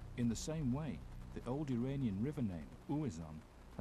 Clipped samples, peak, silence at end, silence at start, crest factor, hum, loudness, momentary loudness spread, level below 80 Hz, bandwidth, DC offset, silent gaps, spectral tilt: under 0.1%; -26 dBFS; 0 s; 0 s; 14 dB; none; -42 LUFS; 12 LU; -54 dBFS; 13.5 kHz; under 0.1%; none; -7 dB/octave